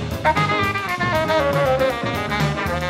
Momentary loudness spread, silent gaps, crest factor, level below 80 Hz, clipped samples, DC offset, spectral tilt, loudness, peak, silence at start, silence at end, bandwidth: 3 LU; none; 16 dB; -38 dBFS; under 0.1%; under 0.1%; -5.5 dB/octave; -20 LUFS; -4 dBFS; 0 s; 0 s; 16 kHz